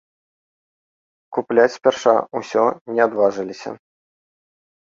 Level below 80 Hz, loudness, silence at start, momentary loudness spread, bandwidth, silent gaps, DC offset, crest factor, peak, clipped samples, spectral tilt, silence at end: -68 dBFS; -19 LUFS; 1.3 s; 14 LU; 7.6 kHz; 2.81-2.85 s; under 0.1%; 20 dB; 0 dBFS; under 0.1%; -4.5 dB/octave; 1.2 s